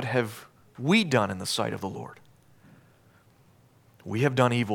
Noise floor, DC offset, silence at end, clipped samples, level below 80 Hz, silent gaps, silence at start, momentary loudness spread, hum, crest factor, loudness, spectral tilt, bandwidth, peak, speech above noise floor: -59 dBFS; under 0.1%; 0 s; under 0.1%; -70 dBFS; none; 0 s; 20 LU; none; 22 dB; -26 LUFS; -5.5 dB/octave; 18 kHz; -6 dBFS; 33 dB